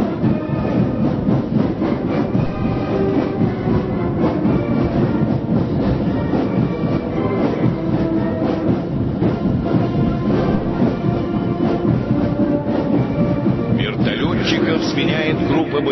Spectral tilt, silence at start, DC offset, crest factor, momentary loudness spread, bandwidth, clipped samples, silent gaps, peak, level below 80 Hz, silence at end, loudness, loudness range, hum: -8.5 dB/octave; 0 s; under 0.1%; 14 dB; 2 LU; 6.2 kHz; under 0.1%; none; -4 dBFS; -34 dBFS; 0 s; -18 LUFS; 1 LU; none